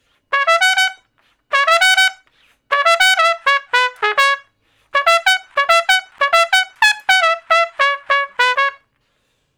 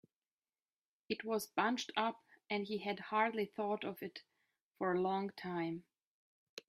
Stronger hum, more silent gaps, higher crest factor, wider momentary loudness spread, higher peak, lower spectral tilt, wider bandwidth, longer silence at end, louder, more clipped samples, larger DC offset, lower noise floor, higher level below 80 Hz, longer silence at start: neither; second, none vs 4.62-4.71 s, 6.03-6.57 s; second, 16 dB vs 22 dB; second, 6 LU vs 13 LU; first, 0 dBFS vs -18 dBFS; second, 3 dB/octave vs -4.5 dB/octave; first, over 20 kHz vs 15 kHz; first, 0.85 s vs 0.1 s; first, -14 LUFS vs -39 LUFS; first, 0.3% vs under 0.1%; neither; second, -65 dBFS vs under -90 dBFS; first, -60 dBFS vs -84 dBFS; second, 0.3 s vs 1.1 s